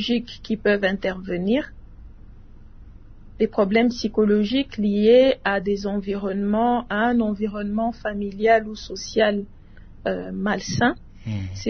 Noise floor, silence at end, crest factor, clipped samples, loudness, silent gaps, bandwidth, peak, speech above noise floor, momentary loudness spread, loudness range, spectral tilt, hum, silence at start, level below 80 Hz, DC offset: -43 dBFS; 0 s; 18 dB; under 0.1%; -22 LUFS; none; 6.6 kHz; -4 dBFS; 22 dB; 11 LU; 5 LU; -6 dB/octave; none; 0 s; -44 dBFS; under 0.1%